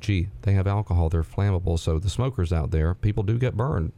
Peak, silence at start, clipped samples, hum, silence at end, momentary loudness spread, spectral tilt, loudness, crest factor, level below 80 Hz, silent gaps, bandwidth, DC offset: -10 dBFS; 0 s; under 0.1%; none; 0.05 s; 2 LU; -7.5 dB/octave; -25 LUFS; 14 dB; -36 dBFS; none; 11 kHz; under 0.1%